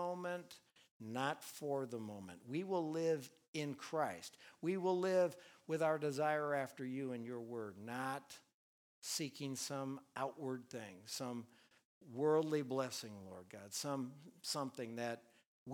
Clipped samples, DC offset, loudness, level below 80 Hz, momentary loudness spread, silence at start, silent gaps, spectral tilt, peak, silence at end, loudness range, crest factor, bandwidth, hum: under 0.1%; under 0.1%; -42 LUFS; under -90 dBFS; 15 LU; 0 s; 0.91-1.00 s, 3.48-3.53 s, 8.54-9.02 s, 11.85-12.01 s, 15.46-15.66 s; -4.5 dB/octave; -24 dBFS; 0 s; 6 LU; 18 dB; over 20 kHz; none